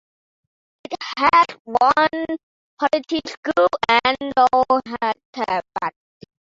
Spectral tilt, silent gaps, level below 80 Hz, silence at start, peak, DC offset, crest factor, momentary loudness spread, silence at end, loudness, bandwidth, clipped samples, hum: -4 dB/octave; 1.60-1.65 s, 2.43-2.77 s, 3.37-3.43 s, 5.25-5.33 s; -58 dBFS; 0.9 s; -2 dBFS; under 0.1%; 18 dB; 13 LU; 0.65 s; -19 LUFS; 7.8 kHz; under 0.1%; none